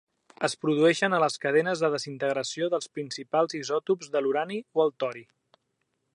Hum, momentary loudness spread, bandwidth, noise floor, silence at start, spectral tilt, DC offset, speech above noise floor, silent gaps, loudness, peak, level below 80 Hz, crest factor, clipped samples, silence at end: none; 8 LU; 11.5 kHz; -77 dBFS; 0.4 s; -4.5 dB/octave; under 0.1%; 51 dB; none; -27 LUFS; -10 dBFS; -80 dBFS; 18 dB; under 0.1%; 0.9 s